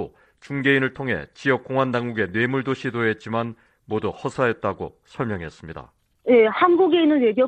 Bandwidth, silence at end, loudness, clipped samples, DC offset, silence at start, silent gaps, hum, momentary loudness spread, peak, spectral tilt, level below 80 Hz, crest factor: 9 kHz; 0 s; -22 LUFS; under 0.1%; under 0.1%; 0 s; none; none; 16 LU; -2 dBFS; -7 dB/octave; -56 dBFS; 20 dB